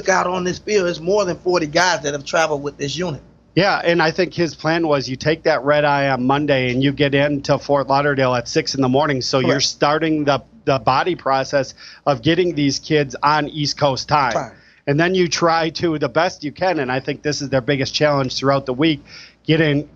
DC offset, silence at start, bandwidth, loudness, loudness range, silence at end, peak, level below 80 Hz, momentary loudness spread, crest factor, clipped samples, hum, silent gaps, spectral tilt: under 0.1%; 0 s; 8 kHz; -18 LUFS; 2 LU; 0.1 s; -2 dBFS; -50 dBFS; 6 LU; 16 dB; under 0.1%; none; none; -5 dB/octave